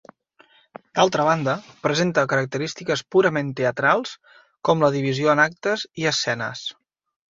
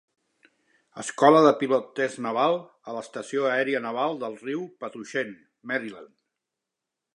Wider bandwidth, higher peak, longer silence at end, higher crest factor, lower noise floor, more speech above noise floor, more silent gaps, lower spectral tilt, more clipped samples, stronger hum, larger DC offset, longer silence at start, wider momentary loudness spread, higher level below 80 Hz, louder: second, 7.8 kHz vs 11 kHz; about the same, -2 dBFS vs -4 dBFS; second, 0.55 s vs 1.1 s; about the same, 20 dB vs 24 dB; second, -57 dBFS vs -86 dBFS; second, 36 dB vs 61 dB; neither; about the same, -4.5 dB/octave vs -5 dB/octave; neither; neither; neither; about the same, 0.95 s vs 0.95 s; second, 9 LU vs 18 LU; first, -62 dBFS vs -82 dBFS; first, -21 LUFS vs -25 LUFS